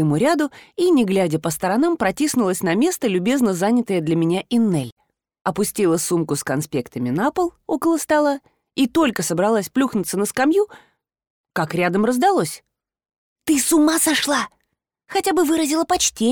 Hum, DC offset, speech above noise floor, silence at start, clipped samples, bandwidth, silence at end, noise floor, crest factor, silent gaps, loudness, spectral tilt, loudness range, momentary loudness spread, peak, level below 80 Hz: none; under 0.1%; 55 dB; 0 s; under 0.1%; over 20 kHz; 0 s; -74 dBFS; 14 dB; 4.92-4.97 s, 5.41-5.45 s, 11.30-11.44 s, 13.18-13.36 s; -19 LUFS; -4.5 dB/octave; 2 LU; 8 LU; -6 dBFS; -56 dBFS